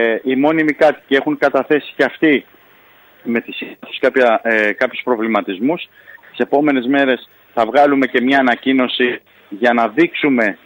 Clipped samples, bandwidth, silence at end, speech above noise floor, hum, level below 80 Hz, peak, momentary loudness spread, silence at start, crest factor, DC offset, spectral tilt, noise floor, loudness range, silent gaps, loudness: under 0.1%; 16.5 kHz; 0.1 s; 32 dB; none; -64 dBFS; -2 dBFS; 11 LU; 0 s; 14 dB; under 0.1%; -6 dB/octave; -48 dBFS; 3 LU; none; -15 LUFS